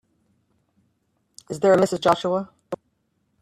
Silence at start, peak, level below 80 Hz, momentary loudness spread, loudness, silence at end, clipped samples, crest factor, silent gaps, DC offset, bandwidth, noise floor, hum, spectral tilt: 1.5 s; -4 dBFS; -64 dBFS; 18 LU; -21 LUFS; 0.65 s; under 0.1%; 20 dB; none; under 0.1%; 13.5 kHz; -71 dBFS; none; -5.5 dB/octave